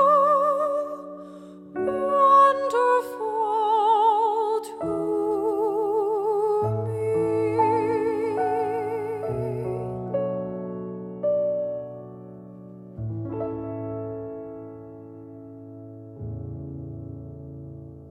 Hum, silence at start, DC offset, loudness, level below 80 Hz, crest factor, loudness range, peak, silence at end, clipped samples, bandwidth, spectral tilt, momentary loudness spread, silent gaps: none; 0 s; under 0.1%; -24 LUFS; -56 dBFS; 18 dB; 16 LU; -8 dBFS; 0 s; under 0.1%; 14 kHz; -7.5 dB/octave; 23 LU; none